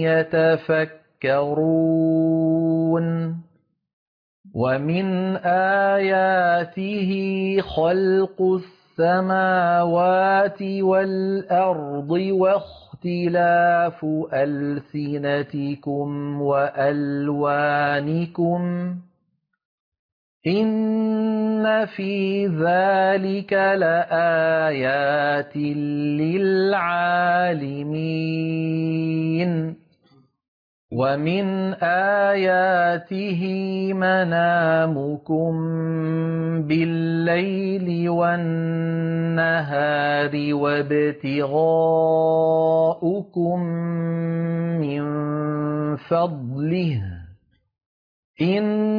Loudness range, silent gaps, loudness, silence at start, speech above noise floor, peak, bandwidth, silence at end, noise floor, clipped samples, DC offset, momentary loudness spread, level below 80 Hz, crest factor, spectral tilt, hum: 5 LU; 3.93-4.44 s, 19.65-19.92 s, 19.99-20.40 s, 30.48-30.88 s, 47.86-48.34 s; -21 LUFS; 0 s; 51 dB; -10 dBFS; 5.2 kHz; 0 s; -72 dBFS; under 0.1%; under 0.1%; 7 LU; -60 dBFS; 12 dB; -10 dB/octave; none